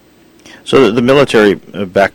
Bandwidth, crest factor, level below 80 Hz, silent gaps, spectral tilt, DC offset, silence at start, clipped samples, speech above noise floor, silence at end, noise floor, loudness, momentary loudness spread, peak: 17 kHz; 12 dB; -44 dBFS; none; -5.5 dB/octave; under 0.1%; 0.65 s; 0.4%; 33 dB; 0.05 s; -42 dBFS; -10 LUFS; 10 LU; 0 dBFS